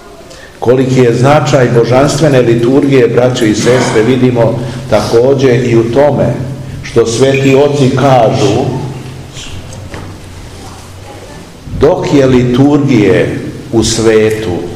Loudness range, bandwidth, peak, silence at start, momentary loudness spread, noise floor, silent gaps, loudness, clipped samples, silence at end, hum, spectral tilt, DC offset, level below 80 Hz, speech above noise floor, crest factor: 7 LU; 13.5 kHz; 0 dBFS; 0.05 s; 19 LU; -31 dBFS; none; -8 LUFS; 3%; 0 s; none; -6 dB/octave; 0.7%; -34 dBFS; 24 dB; 10 dB